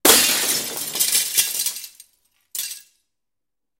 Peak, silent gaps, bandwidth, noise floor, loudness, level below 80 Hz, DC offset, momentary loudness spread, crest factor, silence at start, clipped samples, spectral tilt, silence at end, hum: 0 dBFS; none; 17 kHz; -87 dBFS; -18 LUFS; -60 dBFS; under 0.1%; 19 LU; 22 dB; 0.05 s; under 0.1%; 0.5 dB/octave; 1 s; none